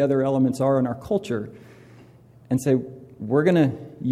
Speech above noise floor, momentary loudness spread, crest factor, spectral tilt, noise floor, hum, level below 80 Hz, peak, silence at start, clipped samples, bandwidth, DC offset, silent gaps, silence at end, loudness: 28 dB; 11 LU; 16 dB; -7.5 dB/octave; -50 dBFS; none; -58 dBFS; -8 dBFS; 0 s; under 0.1%; 14.5 kHz; under 0.1%; none; 0 s; -23 LUFS